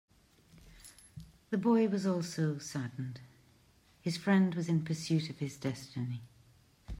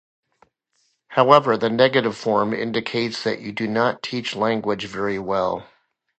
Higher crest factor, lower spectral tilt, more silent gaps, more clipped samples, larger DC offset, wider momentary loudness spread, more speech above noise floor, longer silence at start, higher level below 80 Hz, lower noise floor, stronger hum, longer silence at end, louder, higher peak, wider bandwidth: second, 16 dB vs 22 dB; about the same, -6.5 dB/octave vs -5.5 dB/octave; neither; neither; neither; first, 24 LU vs 11 LU; second, 33 dB vs 48 dB; second, 0.55 s vs 1.1 s; about the same, -62 dBFS vs -60 dBFS; about the same, -65 dBFS vs -68 dBFS; neither; second, 0 s vs 0.55 s; second, -34 LUFS vs -21 LUFS; second, -18 dBFS vs 0 dBFS; first, 15.5 kHz vs 8.8 kHz